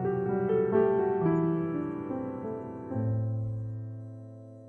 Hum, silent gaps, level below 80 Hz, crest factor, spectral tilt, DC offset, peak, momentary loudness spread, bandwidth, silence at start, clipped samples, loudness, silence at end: none; none; -62 dBFS; 16 dB; -11.5 dB/octave; under 0.1%; -14 dBFS; 16 LU; 3.3 kHz; 0 s; under 0.1%; -30 LUFS; 0 s